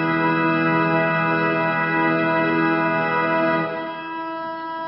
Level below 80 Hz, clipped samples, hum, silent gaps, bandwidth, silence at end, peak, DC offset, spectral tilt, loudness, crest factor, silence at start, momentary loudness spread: -62 dBFS; under 0.1%; none; none; 5.6 kHz; 0 s; -8 dBFS; under 0.1%; -11 dB/octave; -20 LUFS; 14 dB; 0 s; 10 LU